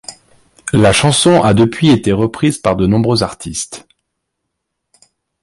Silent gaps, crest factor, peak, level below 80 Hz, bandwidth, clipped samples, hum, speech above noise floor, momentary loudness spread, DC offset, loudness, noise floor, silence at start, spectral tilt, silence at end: none; 14 dB; 0 dBFS; -38 dBFS; 11.5 kHz; under 0.1%; none; 62 dB; 15 LU; under 0.1%; -12 LUFS; -74 dBFS; 0.1 s; -5 dB/octave; 1.65 s